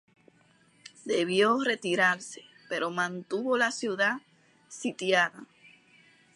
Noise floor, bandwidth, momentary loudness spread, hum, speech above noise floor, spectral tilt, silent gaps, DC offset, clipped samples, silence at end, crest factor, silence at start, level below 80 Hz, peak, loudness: -63 dBFS; 11.5 kHz; 13 LU; none; 36 dB; -3.5 dB/octave; none; under 0.1%; under 0.1%; 0.9 s; 22 dB; 1.05 s; -82 dBFS; -10 dBFS; -28 LUFS